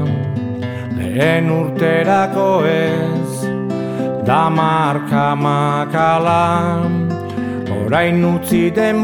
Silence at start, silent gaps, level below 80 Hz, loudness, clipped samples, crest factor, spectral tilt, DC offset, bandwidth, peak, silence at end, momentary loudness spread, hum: 0 s; none; -50 dBFS; -16 LUFS; under 0.1%; 14 dB; -7 dB/octave; under 0.1%; 19 kHz; -2 dBFS; 0 s; 8 LU; none